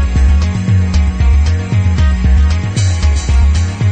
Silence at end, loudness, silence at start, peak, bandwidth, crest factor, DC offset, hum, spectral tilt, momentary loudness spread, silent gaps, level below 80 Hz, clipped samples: 0 s; -13 LUFS; 0 s; -2 dBFS; 8.6 kHz; 8 dB; under 0.1%; none; -6 dB/octave; 2 LU; none; -12 dBFS; under 0.1%